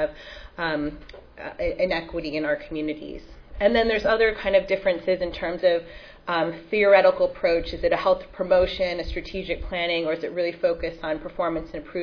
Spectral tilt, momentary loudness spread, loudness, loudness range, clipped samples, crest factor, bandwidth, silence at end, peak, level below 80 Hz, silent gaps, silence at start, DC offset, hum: -6.5 dB/octave; 12 LU; -24 LUFS; 6 LU; under 0.1%; 20 dB; 5.4 kHz; 0 s; -4 dBFS; -42 dBFS; none; 0 s; under 0.1%; none